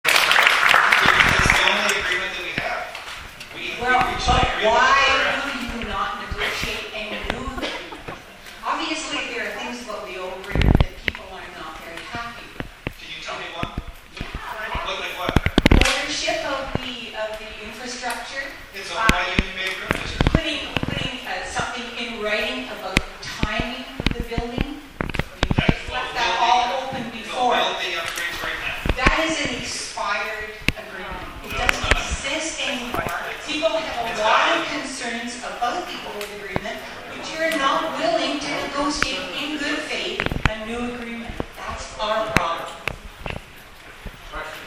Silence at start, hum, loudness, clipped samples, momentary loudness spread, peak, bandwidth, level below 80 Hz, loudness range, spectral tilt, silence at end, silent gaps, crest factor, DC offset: 0.05 s; none; -22 LUFS; under 0.1%; 16 LU; 0 dBFS; 16 kHz; -34 dBFS; 7 LU; -3.5 dB/octave; 0 s; none; 24 dB; under 0.1%